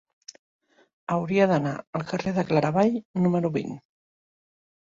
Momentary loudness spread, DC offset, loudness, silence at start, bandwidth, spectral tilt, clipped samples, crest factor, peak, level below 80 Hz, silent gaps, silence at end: 11 LU; under 0.1%; -25 LUFS; 1.1 s; 7.6 kHz; -7.5 dB/octave; under 0.1%; 20 dB; -8 dBFS; -62 dBFS; 1.87-1.93 s, 3.05-3.14 s; 1.1 s